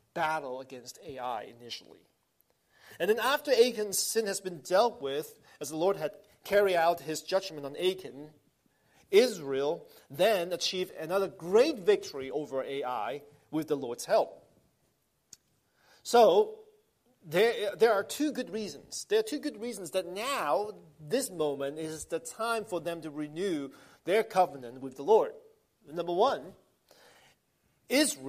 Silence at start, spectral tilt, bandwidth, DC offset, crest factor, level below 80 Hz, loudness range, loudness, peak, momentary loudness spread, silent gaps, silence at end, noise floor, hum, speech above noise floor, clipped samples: 0.15 s; -3 dB/octave; 15.5 kHz; under 0.1%; 20 dB; -74 dBFS; 5 LU; -30 LUFS; -10 dBFS; 15 LU; none; 0 s; -74 dBFS; none; 44 dB; under 0.1%